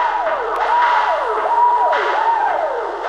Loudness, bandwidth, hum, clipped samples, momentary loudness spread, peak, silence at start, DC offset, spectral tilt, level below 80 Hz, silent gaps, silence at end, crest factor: -16 LUFS; 9.4 kHz; none; under 0.1%; 5 LU; -2 dBFS; 0 s; under 0.1%; -2 dB/octave; -52 dBFS; none; 0 s; 14 dB